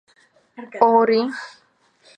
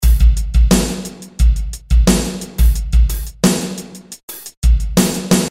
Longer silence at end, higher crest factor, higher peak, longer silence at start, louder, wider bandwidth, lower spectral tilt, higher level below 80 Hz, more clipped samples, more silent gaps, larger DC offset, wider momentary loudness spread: first, 0.7 s vs 0 s; first, 20 dB vs 12 dB; about the same, -2 dBFS vs -2 dBFS; first, 0.6 s vs 0 s; about the same, -18 LUFS vs -16 LUFS; second, 9 kHz vs 16.5 kHz; about the same, -5.5 dB/octave vs -5 dB/octave; second, -80 dBFS vs -16 dBFS; neither; second, none vs 4.23-4.28 s, 4.57-4.62 s; neither; first, 24 LU vs 16 LU